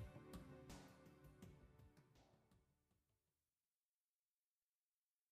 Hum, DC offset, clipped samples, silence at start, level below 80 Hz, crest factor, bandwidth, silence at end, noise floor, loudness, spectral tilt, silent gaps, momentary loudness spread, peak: none; under 0.1%; under 0.1%; 0 s; -74 dBFS; 20 dB; 15 kHz; 2.15 s; under -90 dBFS; -63 LUFS; -5.5 dB/octave; none; 8 LU; -46 dBFS